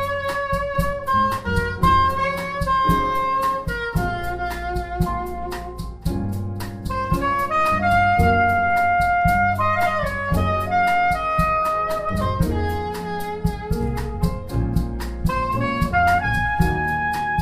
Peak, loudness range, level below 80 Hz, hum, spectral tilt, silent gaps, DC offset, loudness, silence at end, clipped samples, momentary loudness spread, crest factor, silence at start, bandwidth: -4 dBFS; 6 LU; -32 dBFS; none; -6.5 dB/octave; none; under 0.1%; -21 LUFS; 0 s; under 0.1%; 9 LU; 16 dB; 0 s; 16 kHz